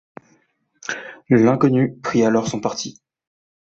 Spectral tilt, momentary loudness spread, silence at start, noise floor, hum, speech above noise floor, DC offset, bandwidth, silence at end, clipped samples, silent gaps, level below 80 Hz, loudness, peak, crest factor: -6 dB/octave; 15 LU; 0.9 s; -62 dBFS; none; 44 dB; under 0.1%; 8 kHz; 0.85 s; under 0.1%; none; -58 dBFS; -19 LUFS; -4 dBFS; 18 dB